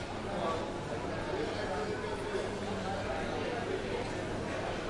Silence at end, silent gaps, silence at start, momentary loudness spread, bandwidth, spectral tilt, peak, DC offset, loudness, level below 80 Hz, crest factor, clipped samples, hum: 0 s; none; 0 s; 2 LU; 11.5 kHz; -5.5 dB/octave; -22 dBFS; under 0.1%; -36 LUFS; -50 dBFS; 12 dB; under 0.1%; none